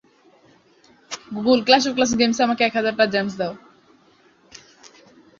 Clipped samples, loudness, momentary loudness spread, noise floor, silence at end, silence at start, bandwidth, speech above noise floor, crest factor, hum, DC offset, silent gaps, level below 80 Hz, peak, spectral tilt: under 0.1%; -19 LUFS; 17 LU; -56 dBFS; 0.5 s; 1.1 s; 7.6 kHz; 37 dB; 22 dB; none; under 0.1%; none; -60 dBFS; -2 dBFS; -3.5 dB/octave